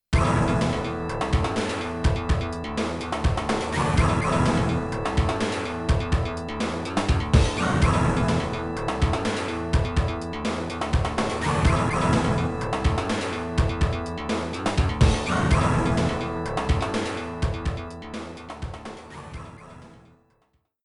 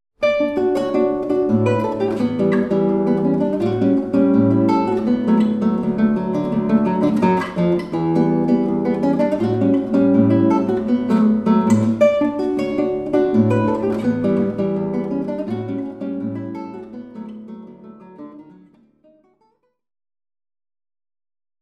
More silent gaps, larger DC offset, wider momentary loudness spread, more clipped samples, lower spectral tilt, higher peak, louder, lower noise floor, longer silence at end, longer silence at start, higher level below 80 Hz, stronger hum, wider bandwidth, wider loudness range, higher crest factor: neither; neither; about the same, 10 LU vs 11 LU; neither; second, -6 dB/octave vs -8.5 dB/octave; about the same, -4 dBFS vs -2 dBFS; second, -25 LUFS vs -18 LUFS; first, -68 dBFS vs -64 dBFS; second, 0.9 s vs 3.2 s; about the same, 0.1 s vs 0.2 s; first, -30 dBFS vs -50 dBFS; neither; first, 11.5 kHz vs 8.8 kHz; second, 5 LU vs 11 LU; about the same, 20 dB vs 16 dB